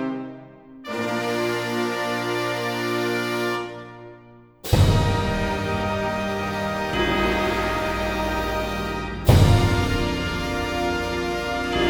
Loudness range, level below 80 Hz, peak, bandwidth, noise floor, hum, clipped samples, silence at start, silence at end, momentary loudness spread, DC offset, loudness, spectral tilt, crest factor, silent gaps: 4 LU; -34 dBFS; -2 dBFS; over 20 kHz; -48 dBFS; none; under 0.1%; 0 s; 0 s; 10 LU; under 0.1%; -23 LUFS; -5.5 dB/octave; 22 dB; none